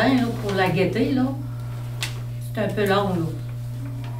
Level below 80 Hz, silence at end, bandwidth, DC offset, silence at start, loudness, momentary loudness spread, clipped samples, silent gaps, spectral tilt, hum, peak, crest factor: -44 dBFS; 0 s; 16 kHz; under 0.1%; 0 s; -24 LUFS; 11 LU; under 0.1%; none; -6.5 dB/octave; 60 Hz at -30 dBFS; -6 dBFS; 16 dB